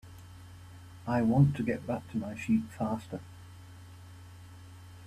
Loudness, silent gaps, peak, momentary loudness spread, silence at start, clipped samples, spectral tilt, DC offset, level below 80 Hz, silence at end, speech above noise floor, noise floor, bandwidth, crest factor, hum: -31 LUFS; none; -12 dBFS; 25 LU; 0.05 s; under 0.1%; -8.5 dB/octave; under 0.1%; -60 dBFS; 0 s; 20 dB; -50 dBFS; 13 kHz; 20 dB; none